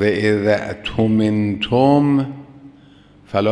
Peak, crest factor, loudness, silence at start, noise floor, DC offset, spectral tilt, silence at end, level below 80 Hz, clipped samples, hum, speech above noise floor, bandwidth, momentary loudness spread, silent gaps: 0 dBFS; 16 dB; -17 LUFS; 0 s; -47 dBFS; under 0.1%; -7.5 dB/octave; 0 s; -46 dBFS; under 0.1%; none; 30 dB; 10 kHz; 10 LU; none